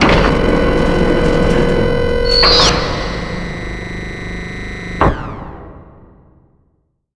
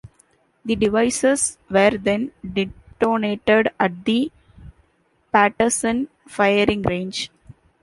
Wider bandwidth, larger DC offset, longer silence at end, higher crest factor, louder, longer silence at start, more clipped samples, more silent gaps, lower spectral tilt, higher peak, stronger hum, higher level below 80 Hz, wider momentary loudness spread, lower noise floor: about the same, 11 kHz vs 11.5 kHz; first, 0.4% vs under 0.1%; first, 1.3 s vs 0.55 s; about the same, 14 dB vs 18 dB; first, -14 LUFS vs -20 LUFS; about the same, 0 s vs 0.05 s; neither; neither; about the same, -5 dB/octave vs -4 dB/octave; about the same, 0 dBFS vs -2 dBFS; neither; first, -22 dBFS vs -48 dBFS; first, 16 LU vs 10 LU; about the same, -61 dBFS vs -63 dBFS